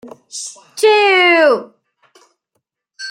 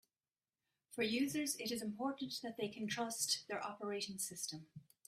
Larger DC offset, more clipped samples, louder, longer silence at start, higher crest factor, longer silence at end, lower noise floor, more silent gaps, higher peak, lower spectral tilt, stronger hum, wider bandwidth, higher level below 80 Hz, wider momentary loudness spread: neither; neither; first, -11 LUFS vs -41 LUFS; second, 0.05 s vs 0.9 s; second, 14 dB vs 20 dB; second, 0 s vs 0.25 s; second, -72 dBFS vs under -90 dBFS; neither; first, -2 dBFS vs -24 dBFS; second, -1 dB/octave vs -2.5 dB/octave; neither; about the same, 16 kHz vs 16 kHz; first, -76 dBFS vs -82 dBFS; first, 19 LU vs 8 LU